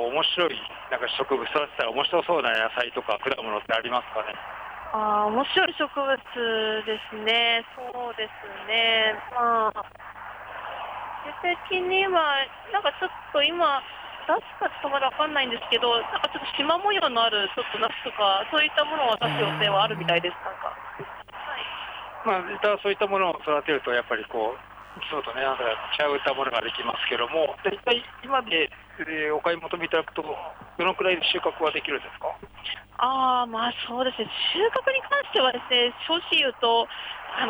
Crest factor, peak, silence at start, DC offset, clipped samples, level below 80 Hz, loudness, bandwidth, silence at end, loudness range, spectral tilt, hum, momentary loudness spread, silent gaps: 16 dB; -10 dBFS; 0 s; under 0.1%; under 0.1%; -60 dBFS; -25 LUFS; over 20 kHz; 0 s; 3 LU; -5 dB/octave; none; 13 LU; none